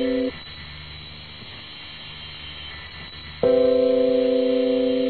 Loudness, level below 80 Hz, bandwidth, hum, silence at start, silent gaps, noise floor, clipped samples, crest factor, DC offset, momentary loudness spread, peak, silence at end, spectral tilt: -20 LUFS; -48 dBFS; 4.5 kHz; none; 0 s; none; -39 dBFS; under 0.1%; 16 dB; 0.3%; 18 LU; -8 dBFS; 0 s; -9 dB/octave